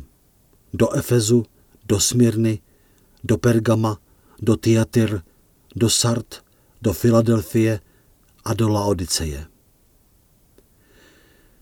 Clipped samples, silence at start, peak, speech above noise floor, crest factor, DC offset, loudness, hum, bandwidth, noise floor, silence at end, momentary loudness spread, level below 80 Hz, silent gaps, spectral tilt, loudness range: under 0.1%; 0 s; -4 dBFS; 39 dB; 18 dB; under 0.1%; -20 LUFS; none; 18.5 kHz; -57 dBFS; 2.15 s; 17 LU; -44 dBFS; none; -5.5 dB/octave; 6 LU